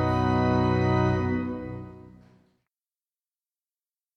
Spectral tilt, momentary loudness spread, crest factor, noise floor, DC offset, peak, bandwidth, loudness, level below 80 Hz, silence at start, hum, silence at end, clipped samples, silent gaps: -8.5 dB/octave; 16 LU; 16 dB; under -90 dBFS; under 0.1%; -12 dBFS; 6.4 kHz; -25 LUFS; -48 dBFS; 0 s; none; 2.05 s; under 0.1%; none